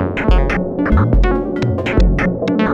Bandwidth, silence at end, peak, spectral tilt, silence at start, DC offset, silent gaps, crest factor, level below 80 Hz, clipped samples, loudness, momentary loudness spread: 7 kHz; 0 s; 0 dBFS; -8 dB/octave; 0 s; under 0.1%; none; 14 dB; -18 dBFS; under 0.1%; -16 LUFS; 4 LU